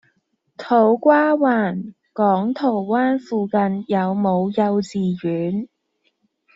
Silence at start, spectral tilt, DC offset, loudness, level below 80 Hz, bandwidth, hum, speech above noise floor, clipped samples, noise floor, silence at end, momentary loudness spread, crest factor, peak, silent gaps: 0.6 s; -6.5 dB/octave; under 0.1%; -19 LUFS; -64 dBFS; 7.8 kHz; none; 50 dB; under 0.1%; -69 dBFS; 0.9 s; 10 LU; 18 dB; -2 dBFS; none